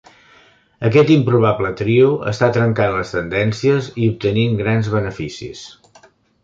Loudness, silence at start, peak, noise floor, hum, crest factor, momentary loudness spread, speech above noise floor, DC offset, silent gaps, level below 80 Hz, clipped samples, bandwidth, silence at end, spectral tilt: -16 LUFS; 0.8 s; -2 dBFS; -51 dBFS; none; 16 dB; 12 LU; 35 dB; under 0.1%; none; -46 dBFS; under 0.1%; 7.6 kHz; 0.75 s; -7.5 dB/octave